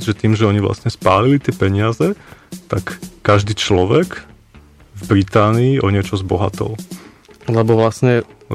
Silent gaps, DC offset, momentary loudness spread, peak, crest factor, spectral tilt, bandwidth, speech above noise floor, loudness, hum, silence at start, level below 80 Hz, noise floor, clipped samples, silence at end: none; under 0.1%; 17 LU; -2 dBFS; 14 dB; -6.5 dB/octave; 14 kHz; 29 dB; -16 LUFS; none; 0 s; -42 dBFS; -44 dBFS; under 0.1%; 0 s